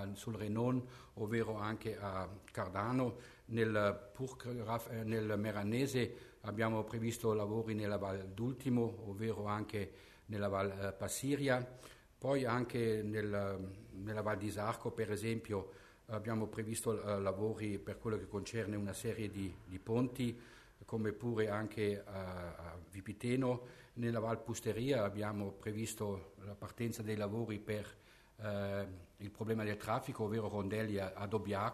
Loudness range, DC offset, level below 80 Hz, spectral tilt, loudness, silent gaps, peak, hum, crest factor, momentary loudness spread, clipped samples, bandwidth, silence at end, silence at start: 3 LU; under 0.1%; -66 dBFS; -6 dB/octave; -40 LUFS; none; -20 dBFS; none; 20 dB; 11 LU; under 0.1%; 13.5 kHz; 0 s; 0 s